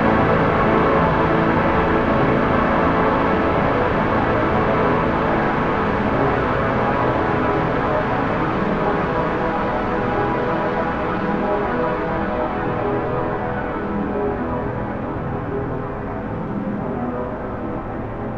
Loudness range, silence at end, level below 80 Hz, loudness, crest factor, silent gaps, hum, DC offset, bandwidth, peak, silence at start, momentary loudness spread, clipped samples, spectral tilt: 7 LU; 0 s; -34 dBFS; -20 LUFS; 16 dB; none; none; under 0.1%; 7.6 kHz; -2 dBFS; 0 s; 9 LU; under 0.1%; -8.5 dB/octave